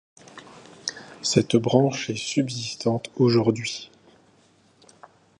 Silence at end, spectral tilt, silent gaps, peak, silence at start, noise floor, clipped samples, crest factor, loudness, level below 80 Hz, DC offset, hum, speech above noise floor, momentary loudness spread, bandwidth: 1.55 s; -5 dB/octave; none; -2 dBFS; 0.35 s; -59 dBFS; under 0.1%; 22 dB; -24 LUFS; -62 dBFS; under 0.1%; none; 37 dB; 20 LU; 11 kHz